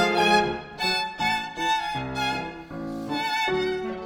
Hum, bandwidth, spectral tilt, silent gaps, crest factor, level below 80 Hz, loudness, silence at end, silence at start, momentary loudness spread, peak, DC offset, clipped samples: none; over 20 kHz; -3.5 dB/octave; none; 18 dB; -52 dBFS; -25 LUFS; 0 s; 0 s; 12 LU; -8 dBFS; under 0.1%; under 0.1%